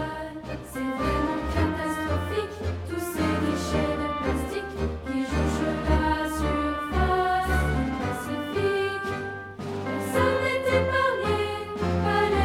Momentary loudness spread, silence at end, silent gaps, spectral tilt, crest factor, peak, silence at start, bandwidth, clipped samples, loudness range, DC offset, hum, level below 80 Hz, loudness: 8 LU; 0 s; none; -6 dB/octave; 16 dB; -10 dBFS; 0 s; 16.5 kHz; under 0.1%; 2 LU; under 0.1%; none; -38 dBFS; -27 LUFS